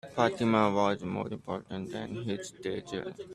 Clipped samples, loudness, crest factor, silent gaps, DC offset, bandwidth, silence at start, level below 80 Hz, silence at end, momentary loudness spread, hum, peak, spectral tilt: under 0.1%; -32 LUFS; 22 dB; none; under 0.1%; 12 kHz; 0.05 s; -66 dBFS; 0 s; 12 LU; none; -10 dBFS; -6 dB/octave